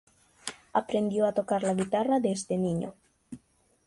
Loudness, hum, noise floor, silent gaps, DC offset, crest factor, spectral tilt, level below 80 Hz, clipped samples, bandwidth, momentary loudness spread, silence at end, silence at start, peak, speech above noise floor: -28 LUFS; none; -64 dBFS; none; under 0.1%; 18 dB; -6 dB/octave; -66 dBFS; under 0.1%; 11.5 kHz; 21 LU; 0.5 s; 0.45 s; -12 dBFS; 36 dB